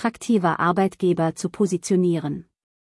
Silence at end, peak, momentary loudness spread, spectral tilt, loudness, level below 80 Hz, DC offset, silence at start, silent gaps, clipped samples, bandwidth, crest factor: 0.4 s; -6 dBFS; 6 LU; -6.5 dB/octave; -22 LUFS; -62 dBFS; under 0.1%; 0 s; none; under 0.1%; 12 kHz; 16 dB